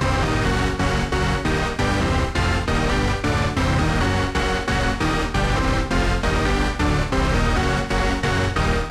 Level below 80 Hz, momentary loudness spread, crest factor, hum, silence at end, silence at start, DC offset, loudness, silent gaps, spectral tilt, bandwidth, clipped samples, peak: -26 dBFS; 1 LU; 14 dB; none; 0 s; 0 s; under 0.1%; -21 LUFS; none; -5.5 dB/octave; 13.5 kHz; under 0.1%; -6 dBFS